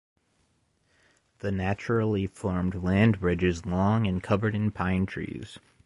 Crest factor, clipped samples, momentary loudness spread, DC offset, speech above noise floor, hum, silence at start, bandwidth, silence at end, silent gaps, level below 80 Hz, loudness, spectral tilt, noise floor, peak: 18 dB; under 0.1%; 11 LU; under 0.1%; 43 dB; none; 1.45 s; 11.5 kHz; 0.3 s; none; -44 dBFS; -27 LUFS; -8 dB/octave; -70 dBFS; -10 dBFS